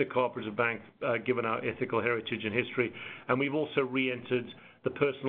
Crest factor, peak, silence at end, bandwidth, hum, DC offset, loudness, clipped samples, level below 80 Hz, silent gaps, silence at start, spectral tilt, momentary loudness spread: 20 dB; -12 dBFS; 0 s; 4.3 kHz; none; under 0.1%; -31 LUFS; under 0.1%; -72 dBFS; none; 0 s; -4 dB/octave; 5 LU